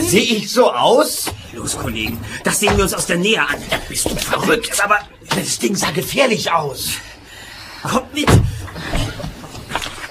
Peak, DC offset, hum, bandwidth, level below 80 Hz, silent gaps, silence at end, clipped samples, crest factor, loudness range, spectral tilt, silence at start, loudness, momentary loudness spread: 0 dBFS; under 0.1%; none; 15.5 kHz; -32 dBFS; none; 0 s; under 0.1%; 18 dB; 3 LU; -3.5 dB/octave; 0 s; -17 LUFS; 13 LU